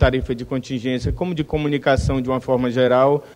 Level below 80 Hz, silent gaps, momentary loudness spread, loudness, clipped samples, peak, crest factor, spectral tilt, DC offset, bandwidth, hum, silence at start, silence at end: -30 dBFS; none; 8 LU; -20 LUFS; under 0.1%; -4 dBFS; 16 dB; -7 dB/octave; under 0.1%; 11.5 kHz; none; 0 s; 0.05 s